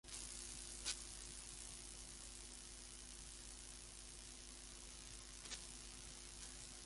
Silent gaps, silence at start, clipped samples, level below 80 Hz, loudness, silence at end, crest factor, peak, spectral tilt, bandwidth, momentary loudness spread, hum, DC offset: none; 0.05 s; under 0.1%; -62 dBFS; -52 LUFS; 0 s; 26 dB; -28 dBFS; -1 dB/octave; 11.5 kHz; 7 LU; none; under 0.1%